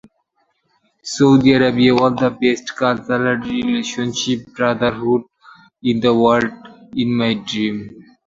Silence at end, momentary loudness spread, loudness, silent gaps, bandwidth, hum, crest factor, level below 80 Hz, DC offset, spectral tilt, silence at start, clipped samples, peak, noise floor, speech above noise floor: 0.25 s; 10 LU; -17 LUFS; none; 7.8 kHz; none; 16 dB; -52 dBFS; under 0.1%; -5.5 dB/octave; 1.05 s; under 0.1%; -2 dBFS; -66 dBFS; 50 dB